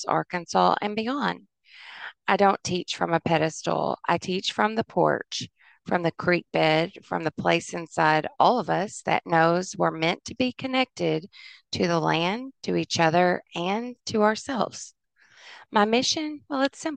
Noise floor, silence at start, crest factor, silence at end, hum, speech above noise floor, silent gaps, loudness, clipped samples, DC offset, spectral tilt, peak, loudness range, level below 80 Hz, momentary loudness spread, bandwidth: -57 dBFS; 0 s; 22 dB; 0 s; none; 32 dB; none; -25 LUFS; under 0.1%; under 0.1%; -4.5 dB/octave; -4 dBFS; 2 LU; -66 dBFS; 10 LU; 9.8 kHz